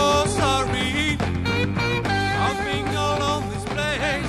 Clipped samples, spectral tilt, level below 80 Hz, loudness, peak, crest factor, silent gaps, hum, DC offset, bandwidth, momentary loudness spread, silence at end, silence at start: under 0.1%; -4.5 dB/octave; -36 dBFS; -22 LUFS; -8 dBFS; 14 dB; none; none; under 0.1%; 14.5 kHz; 4 LU; 0 s; 0 s